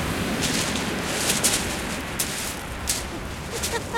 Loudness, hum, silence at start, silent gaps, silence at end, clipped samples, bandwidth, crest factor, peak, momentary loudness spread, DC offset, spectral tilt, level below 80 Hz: -25 LUFS; none; 0 s; none; 0 s; under 0.1%; 17 kHz; 22 dB; -6 dBFS; 9 LU; 0.1%; -2.5 dB/octave; -40 dBFS